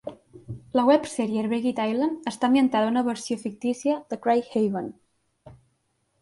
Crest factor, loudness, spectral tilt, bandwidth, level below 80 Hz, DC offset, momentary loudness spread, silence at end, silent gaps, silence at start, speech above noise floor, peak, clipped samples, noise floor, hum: 18 dB; -24 LUFS; -5.5 dB/octave; 11.5 kHz; -64 dBFS; under 0.1%; 11 LU; 0.7 s; none; 0.05 s; 48 dB; -6 dBFS; under 0.1%; -72 dBFS; none